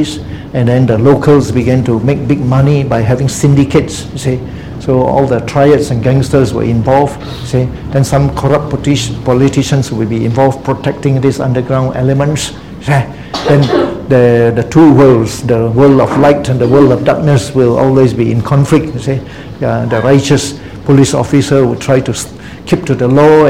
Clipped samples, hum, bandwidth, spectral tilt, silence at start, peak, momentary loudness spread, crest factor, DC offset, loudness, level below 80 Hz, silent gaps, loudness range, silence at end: 0.9%; none; 14 kHz; -7 dB/octave; 0 s; 0 dBFS; 10 LU; 10 dB; 0.8%; -10 LUFS; -32 dBFS; none; 4 LU; 0 s